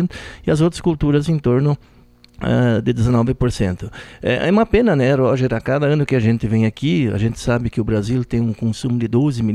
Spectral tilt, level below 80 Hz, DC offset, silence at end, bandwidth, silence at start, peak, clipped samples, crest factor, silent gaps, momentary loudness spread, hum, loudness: -7.5 dB/octave; -36 dBFS; under 0.1%; 0 s; 11.5 kHz; 0 s; -2 dBFS; under 0.1%; 16 dB; none; 7 LU; none; -18 LUFS